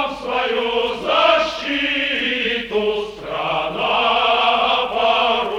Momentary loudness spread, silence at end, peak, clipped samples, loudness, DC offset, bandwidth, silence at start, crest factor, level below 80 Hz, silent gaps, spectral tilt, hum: 7 LU; 0 s; -2 dBFS; under 0.1%; -18 LUFS; under 0.1%; 12 kHz; 0 s; 16 dB; -48 dBFS; none; -3.5 dB/octave; none